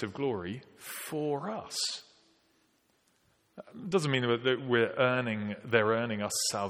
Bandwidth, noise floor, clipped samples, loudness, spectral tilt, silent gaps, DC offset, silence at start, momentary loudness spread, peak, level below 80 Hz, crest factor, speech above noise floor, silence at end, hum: 17.5 kHz; -71 dBFS; under 0.1%; -31 LUFS; -4 dB/octave; none; under 0.1%; 0 s; 14 LU; -8 dBFS; -74 dBFS; 24 dB; 40 dB; 0 s; none